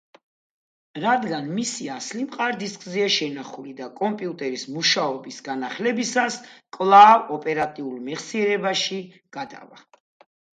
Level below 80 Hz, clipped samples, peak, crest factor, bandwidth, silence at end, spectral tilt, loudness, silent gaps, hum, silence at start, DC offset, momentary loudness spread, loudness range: -74 dBFS; under 0.1%; -2 dBFS; 22 dB; 9.4 kHz; 0.85 s; -3 dB/octave; -22 LUFS; none; none; 0.95 s; under 0.1%; 18 LU; 8 LU